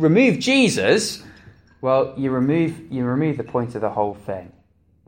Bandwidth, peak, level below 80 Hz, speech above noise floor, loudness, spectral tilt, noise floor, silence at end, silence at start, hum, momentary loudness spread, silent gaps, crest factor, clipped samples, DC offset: 16.5 kHz; -2 dBFS; -56 dBFS; 29 dB; -20 LUFS; -5.5 dB/octave; -48 dBFS; 0.6 s; 0 s; none; 12 LU; none; 18 dB; under 0.1%; under 0.1%